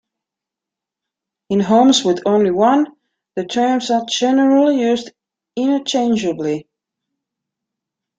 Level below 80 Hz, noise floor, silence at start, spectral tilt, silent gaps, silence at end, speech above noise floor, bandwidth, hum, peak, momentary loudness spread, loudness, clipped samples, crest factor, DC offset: -62 dBFS; -85 dBFS; 1.5 s; -4.5 dB/octave; none; 1.55 s; 70 dB; 9.2 kHz; none; -2 dBFS; 11 LU; -16 LUFS; under 0.1%; 16 dB; under 0.1%